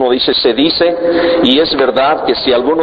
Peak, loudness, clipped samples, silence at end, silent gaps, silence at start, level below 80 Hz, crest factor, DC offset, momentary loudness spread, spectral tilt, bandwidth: 0 dBFS; -11 LUFS; under 0.1%; 0 s; none; 0 s; -42 dBFS; 12 dB; under 0.1%; 2 LU; -6.5 dB/octave; 5.2 kHz